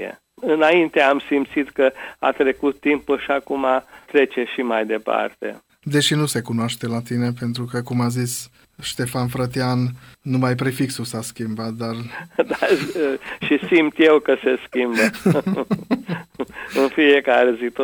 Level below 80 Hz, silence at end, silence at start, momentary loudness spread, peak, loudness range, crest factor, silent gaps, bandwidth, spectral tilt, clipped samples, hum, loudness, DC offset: -58 dBFS; 0 s; 0 s; 13 LU; -4 dBFS; 5 LU; 16 dB; none; over 20 kHz; -5.5 dB/octave; under 0.1%; none; -20 LUFS; under 0.1%